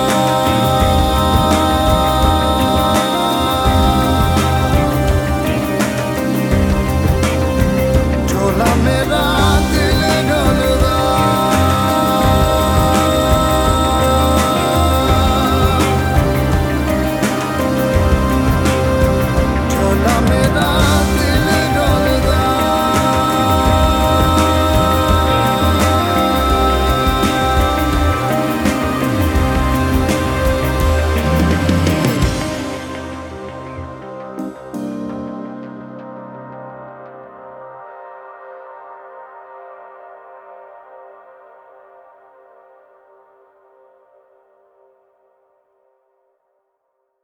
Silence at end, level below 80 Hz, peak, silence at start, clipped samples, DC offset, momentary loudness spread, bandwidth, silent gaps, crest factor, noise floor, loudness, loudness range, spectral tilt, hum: 6.2 s; -22 dBFS; 0 dBFS; 0 s; under 0.1%; under 0.1%; 16 LU; over 20 kHz; none; 14 dB; -69 dBFS; -14 LUFS; 15 LU; -5.5 dB/octave; none